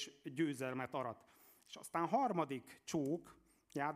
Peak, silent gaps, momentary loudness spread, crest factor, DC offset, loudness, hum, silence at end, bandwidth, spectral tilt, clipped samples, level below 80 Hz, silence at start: -24 dBFS; none; 13 LU; 18 dB; under 0.1%; -41 LUFS; none; 0 s; 15.5 kHz; -5.5 dB/octave; under 0.1%; -82 dBFS; 0 s